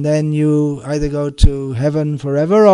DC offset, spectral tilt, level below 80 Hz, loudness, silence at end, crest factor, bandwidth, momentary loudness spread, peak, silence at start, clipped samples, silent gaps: under 0.1%; -7.5 dB/octave; -22 dBFS; -16 LUFS; 0 s; 14 dB; 11 kHz; 5 LU; 0 dBFS; 0 s; 0.4%; none